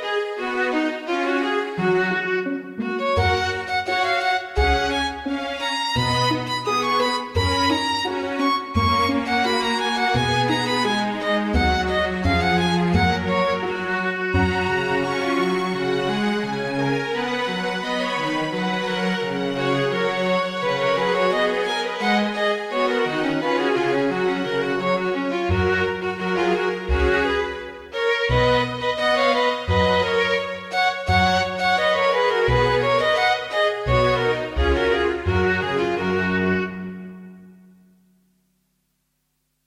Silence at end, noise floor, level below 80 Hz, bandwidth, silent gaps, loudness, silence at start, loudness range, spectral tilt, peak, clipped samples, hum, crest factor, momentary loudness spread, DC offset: 2.15 s; -72 dBFS; -36 dBFS; 15 kHz; none; -21 LUFS; 0 s; 4 LU; -5.5 dB/octave; -6 dBFS; under 0.1%; none; 16 dB; 5 LU; under 0.1%